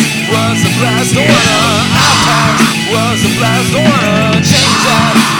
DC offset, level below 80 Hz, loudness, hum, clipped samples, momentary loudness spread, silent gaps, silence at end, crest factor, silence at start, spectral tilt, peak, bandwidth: 0.4%; -36 dBFS; -9 LUFS; none; 0.4%; 4 LU; none; 0 s; 10 dB; 0 s; -4 dB/octave; 0 dBFS; 19.5 kHz